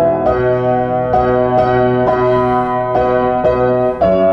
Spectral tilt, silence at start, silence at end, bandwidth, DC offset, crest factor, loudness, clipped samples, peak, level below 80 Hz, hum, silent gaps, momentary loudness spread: -9 dB/octave; 0 s; 0 s; 5.8 kHz; under 0.1%; 12 dB; -13 LUFS; under 0.1%; -2 dBFS; -34 dBFS; none; none; 2 LU